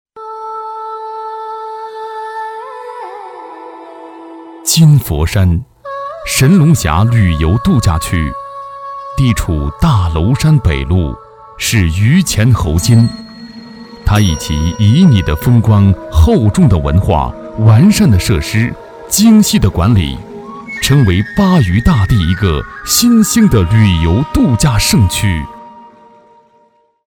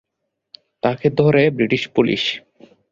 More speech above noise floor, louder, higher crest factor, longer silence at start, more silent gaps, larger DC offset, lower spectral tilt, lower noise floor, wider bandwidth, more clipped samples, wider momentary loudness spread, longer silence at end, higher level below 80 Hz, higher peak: second, 43 dB vs 60 dB; first, -11 LUFS vs -18 LUFS; about the same, 12 dB vs 16 dB; second, 0.15 s vs 0.85 s; neither; neither; about the same, -5.5 dB/octave vs -6.5 dB/octave; second, -52 dBFS vs -77 dBFS; first, 19 kHz vs 7.6 kHz; neither; first, 19 LU vs 8 LU; first, 1.25 s vs 0.5 s; first, -24 dBFS vs -54 dBFS; about the same, 0 dBFS vs -2 dBFS